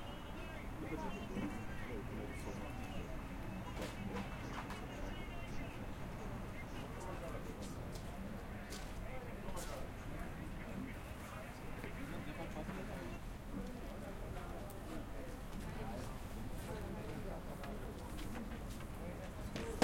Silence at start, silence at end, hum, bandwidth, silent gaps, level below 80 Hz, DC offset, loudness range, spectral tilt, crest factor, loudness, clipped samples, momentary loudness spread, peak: 0 s; 0 s; none; 16.5 kHz; none; -50 dBFS; under 0.1%; 2 LU; -5.5 dB/octave; 28 dB; -47 LUFS; under 0.1%; 4 LU; -16 dBFS